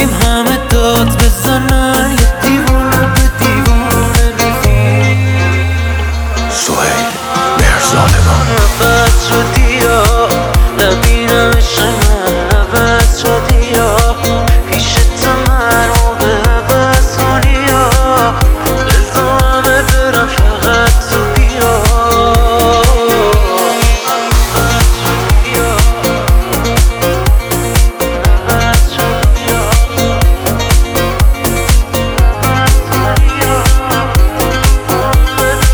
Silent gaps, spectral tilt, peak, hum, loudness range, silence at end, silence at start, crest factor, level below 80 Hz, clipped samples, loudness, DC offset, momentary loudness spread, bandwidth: none; -4.5 dB/octave; 0 dBFS; none; 2 LU; 0 s; 0 s; 8 dB; -12 dBFS; under 0.1%; -10 LUFS; 0.3%; 3 LU; over 20 kHz